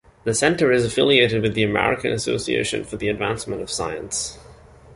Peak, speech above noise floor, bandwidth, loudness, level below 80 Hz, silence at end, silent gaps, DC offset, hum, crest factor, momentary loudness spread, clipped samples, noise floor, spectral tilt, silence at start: -2 dBFS; 25 dB; 11.5 kHz; -21 LUFS; -46 dBFS; 0.4 s; none; under 0.1%; none; 20 dB; 10 LU; under 0.1%; -46 dBFS; -4 dB/octave; 0.25 s